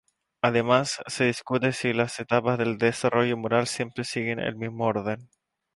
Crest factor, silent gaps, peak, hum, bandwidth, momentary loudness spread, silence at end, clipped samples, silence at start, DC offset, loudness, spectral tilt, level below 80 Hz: 22 dB; none; -4 dBFS; none; 11.5 kHz; 7 LU; 0.5 s; under 0.1%; 0.45 s; under 0.1%; -26 LUFS; -5 dB/octave; -62 dBFS